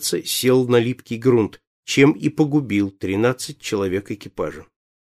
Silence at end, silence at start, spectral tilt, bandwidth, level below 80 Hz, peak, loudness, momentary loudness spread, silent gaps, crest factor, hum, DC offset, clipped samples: 0.55 s; 0 s; -5 dB/octave; 15.5 kHz; -56 dBFS; -2 dBFS; -20 LUFS; 12 LU; 1.67-1.83 s; 18 dB; none; under 0.1%; under 0.1%